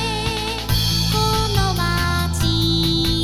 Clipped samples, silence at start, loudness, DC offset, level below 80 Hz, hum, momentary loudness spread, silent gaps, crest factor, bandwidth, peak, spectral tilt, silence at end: under 0.1%; 0 s; -19 LUFS; 0.4%; -28 dBFS; none; 4 LU; none; 16 dB; 19 kHz; -4 dBFS; -4.5 dB/octave; 0 s